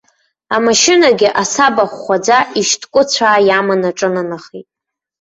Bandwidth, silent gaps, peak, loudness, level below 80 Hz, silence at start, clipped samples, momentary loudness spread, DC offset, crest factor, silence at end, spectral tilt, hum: 8.2 kHz; none; 0 dBFS; -12 LUFS; -56 dBFS; 0.5 s; under 0.1%; 8 LU; under 0.1%; 14 dB; 0.6 s; -2.5 dB/octave; none